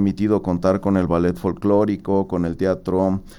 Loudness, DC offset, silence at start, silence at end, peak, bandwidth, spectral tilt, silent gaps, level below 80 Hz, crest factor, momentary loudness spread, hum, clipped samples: -20 LUFS; under 0.1%; 0 s; 0.05 s; -4 dBFS; 12.5 kHz; -9 dB/octave; none; -42 dBFS; 14 dB; 3 LU; none; under 0.1%